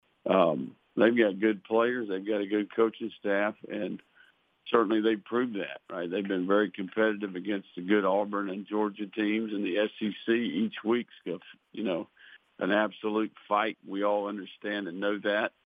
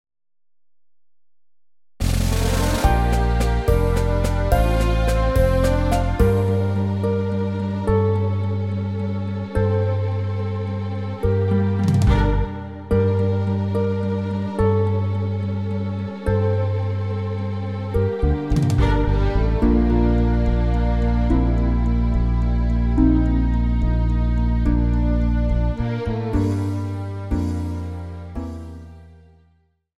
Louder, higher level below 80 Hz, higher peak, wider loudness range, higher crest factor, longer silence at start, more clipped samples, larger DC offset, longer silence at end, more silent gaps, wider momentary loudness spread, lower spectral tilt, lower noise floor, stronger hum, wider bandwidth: second, -30 LUFS vs -21 LUFS; second, -84 dBFS vs -24 dBFS; second, -8 dBFS vs -2 dBFS; about the same, 3 LU vs 4 LU; about the same, 22 dB vs 18 dB; second, 0.25 s vs 2 s; neither; second, under 0.1% vs 0.4%; second, 0.15 s vs 0.8 s; neither; first, 11 LU vs 8 LU; about the same, -8.5 dB/octave vs -7.5 dB/octave; about the same, -63 dBFS vs -62 dBFS; neither; second, 4.9 kHz vs 15 kHz